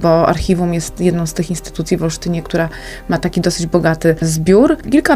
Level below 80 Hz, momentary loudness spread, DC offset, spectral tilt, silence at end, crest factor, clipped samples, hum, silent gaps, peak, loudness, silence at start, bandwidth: -32 dBFS; 9 LU; under 0.1%; -6 dB/octave; 0 s; 14 dB; under 0.1%; none; none; 0 dBFS; -15 LUFS; 0 s; 15.5 kHz